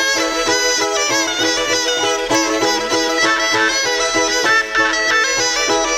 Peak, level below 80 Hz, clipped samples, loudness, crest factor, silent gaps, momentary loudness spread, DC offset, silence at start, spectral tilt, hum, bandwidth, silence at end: -4 dBFS; -44 dBFS; under 0.1%; -15 LUFS; 12 dB; none; 2 LU; under 0.1%; 0 s; -0.5 dB/octave; none; 18 kHz; 0 s